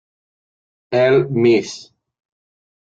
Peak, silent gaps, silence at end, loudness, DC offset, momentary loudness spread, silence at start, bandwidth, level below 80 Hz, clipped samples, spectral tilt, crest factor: -4 dBFS; none; 1 s; -16 LUFS; under 0.1%; 16 LU; 0.9 s; 7.8 kHz; -60 dBFS; under 0.1%; -6.5 dB/octave; 16 dB